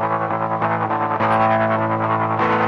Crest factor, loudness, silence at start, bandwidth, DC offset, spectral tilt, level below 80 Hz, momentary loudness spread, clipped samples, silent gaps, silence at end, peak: 12 dB; -19 LUFS; 0 s; 10.5 kHz; under 0.1%; -8.5 dB/octave; -56 dBFS; 4 LU; under 0.1%; none; 0 s; -6 dBFS